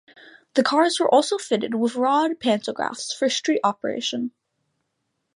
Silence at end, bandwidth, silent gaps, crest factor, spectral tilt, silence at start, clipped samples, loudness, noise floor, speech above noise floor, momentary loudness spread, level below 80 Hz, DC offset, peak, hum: 1.05 s; 11.5 kHz; none; 18 dB; -3 dB/octave; 0.55 s; under 0.1%; -22 LUFS; -76 dBFS; 54 dB; 9 LU; -74 dBFS; under 0.1%; -4 dBFS; none